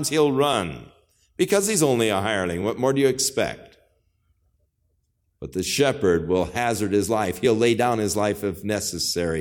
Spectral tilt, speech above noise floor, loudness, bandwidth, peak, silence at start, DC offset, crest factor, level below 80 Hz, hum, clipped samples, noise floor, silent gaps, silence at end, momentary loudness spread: -4 dB/octave; 48 dB; -22 LUFS; 19 kHz; -4 dBFS; 0 s; under 0.1%; 18 dB; -52 dBFS; none; under 0.1%; -70 dBFS; none; 0 s; 8 LU